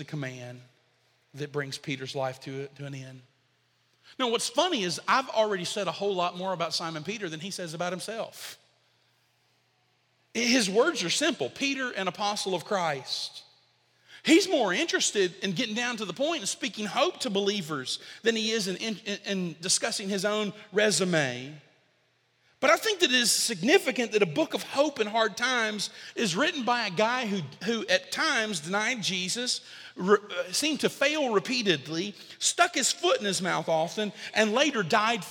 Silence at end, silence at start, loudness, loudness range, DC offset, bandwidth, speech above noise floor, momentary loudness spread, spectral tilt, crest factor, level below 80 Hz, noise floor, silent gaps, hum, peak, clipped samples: 0 s; 0 s; -27 LUFS; 7 LU; under 0.1%; 18 kHz; 42 dB; 11 LU; -2.5 dB/octave; 22 dB; -78 dBFS; -70 dBFS; none; none; -6 dBFS; under 0.1%